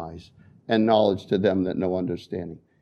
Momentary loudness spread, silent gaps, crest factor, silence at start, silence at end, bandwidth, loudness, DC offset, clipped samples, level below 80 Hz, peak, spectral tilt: 18 LU; none; 18 dB; 0 s; 0.25 s; 8.2 kHz; -24 LUFS; under 0.1%; under 0.1%; -58 dBFS; -6 dBFS; -8 dB/octave